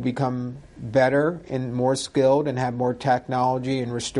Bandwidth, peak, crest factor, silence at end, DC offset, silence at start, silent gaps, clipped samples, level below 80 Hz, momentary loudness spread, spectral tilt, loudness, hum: 11.5 kHz; -8 dBFS; 16 dB; 0 s; under 0.1%; 0 s; none; under 0.1%; -54 dBFS; 9 LU; -6 dB/octave; -23 LUFS; none